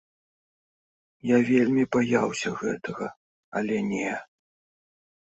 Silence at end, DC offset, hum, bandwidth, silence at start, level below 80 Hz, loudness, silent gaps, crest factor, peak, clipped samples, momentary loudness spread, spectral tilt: 1.1 s; under 0.1%; none; 8.2 kHz; 1.25 s; -66 dBFS; -26 LUFS; 3.17-3.52 s; 18 dB; -8 dBFS; under 0.1%; 14 LU; -6 dB/octave